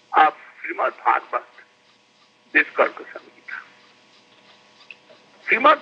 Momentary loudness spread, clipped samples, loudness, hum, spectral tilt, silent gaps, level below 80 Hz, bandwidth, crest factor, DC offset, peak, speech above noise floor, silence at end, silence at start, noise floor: 19 LU; under 0.1%; -20 LUFS; none; -4 dB/octave; none; -88 dBFS; 7.8 kHz; 22 dB; under 0.1%; -2 dBFS; 38 dB; 0 s; 0.1 s; -58 dBFS